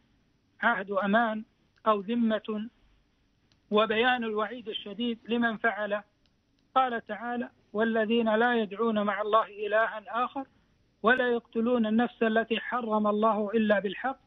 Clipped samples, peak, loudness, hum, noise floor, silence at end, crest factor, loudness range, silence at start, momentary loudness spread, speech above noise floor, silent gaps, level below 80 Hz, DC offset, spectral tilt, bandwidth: under 0.1%; -10 dBFS; -28 LUFS; none; -69 dBFS; 0.1 s; 18 dB; 3 LU; 0.6 s; 9 LU; 41 dB; none; -70 dBFS; under 0.1%; -3 dB/octave; 4.5 kHz